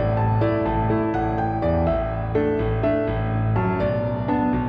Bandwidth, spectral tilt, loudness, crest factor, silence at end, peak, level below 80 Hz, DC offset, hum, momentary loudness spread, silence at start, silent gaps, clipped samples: 5.2 kHz; -10.5 dB/octave; -22 LUFS; 12 dB; 0 s; -8 dBFS; -34 dBFS; under 0.1%; none; 3 LU; 0 s; none; under 0.1%